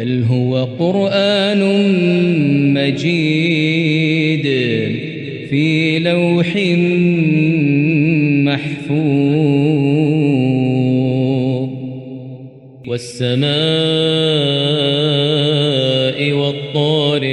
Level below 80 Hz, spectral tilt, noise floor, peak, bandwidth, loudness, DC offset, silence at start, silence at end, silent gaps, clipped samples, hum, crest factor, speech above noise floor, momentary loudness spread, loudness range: -58 dBFS; -7 dB/octave; -36 dBFS; -4 dBFS; 11 kHz; -15 LUFS; under 0.1%; 0 s; 0 s; none; under 0.1%; none; 10 dB; 22 dB; 7 LU; 3 LU